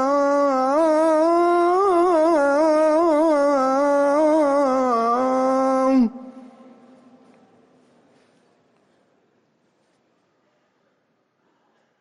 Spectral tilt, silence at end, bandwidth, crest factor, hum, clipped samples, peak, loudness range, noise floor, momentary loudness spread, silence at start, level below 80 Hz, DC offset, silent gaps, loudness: -5 dB/octave; 5.6 s; 11.5 kHz; 12 dB; none; under 0.1%; -10 dBFS; 7 LU; -68 dBFS; 2 LU; 0 s; -62 dBFS; under 0.1%; none; -18 LUFS